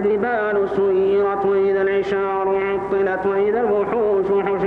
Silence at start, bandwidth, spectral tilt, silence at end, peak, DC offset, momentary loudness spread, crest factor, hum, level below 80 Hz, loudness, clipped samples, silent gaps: 0 s; 4.8 kHz; -8 dB/octave; 0 s; -6 dBFS; under 0.1%; 3 LU; 12 dB; none; -52 dBFS; -19 LUFS; under 0.1%; none